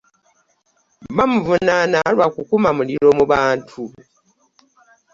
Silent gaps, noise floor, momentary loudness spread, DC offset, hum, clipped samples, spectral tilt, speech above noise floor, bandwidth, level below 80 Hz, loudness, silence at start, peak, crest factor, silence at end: none; -63 dBFS; 10 LU; under 0.1%; none; under 0.1%; -6 dB/octave; 47 dB; 7.4 kHz; -50 dBFS; -16 LUFS; 1 s; -2 dBFS; 16 dB; 1.25 s